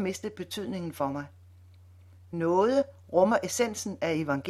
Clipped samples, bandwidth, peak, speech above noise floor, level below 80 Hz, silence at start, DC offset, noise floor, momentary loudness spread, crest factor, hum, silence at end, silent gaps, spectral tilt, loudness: under 0.1%; 15.5 kHz; -10 dBFS; 25 dB; -64 dBFS; 0 s; under 0.1%; -53 dBFS; 12 LU; 20 dB; none; 0 s; none; -5 dB/octave; -29 LUFS